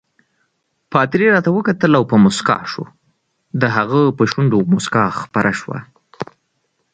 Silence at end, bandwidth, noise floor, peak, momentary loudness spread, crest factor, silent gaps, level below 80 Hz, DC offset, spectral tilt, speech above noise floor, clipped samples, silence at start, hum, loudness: 0.7 s; 9.4 kHz; -68 dBFS; 0 dBFS; 17 LU; 16 dB; none; -54 dBFS; under 0.1%; -6.5 dB/octave; 53 dB; under 0.1%; 0.9 s; none; -15 LUFS